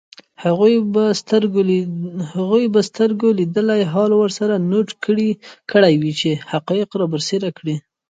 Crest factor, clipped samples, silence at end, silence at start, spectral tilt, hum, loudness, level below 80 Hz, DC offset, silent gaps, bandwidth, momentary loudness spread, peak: 18 dB; under 0.1%; 0.3 s; 0.4 s; -6 dB/octave; none; -17 LUFS; -64 dBFS; under 0.1%; none; 9.2 kHz; 9 LU; 0 dBFS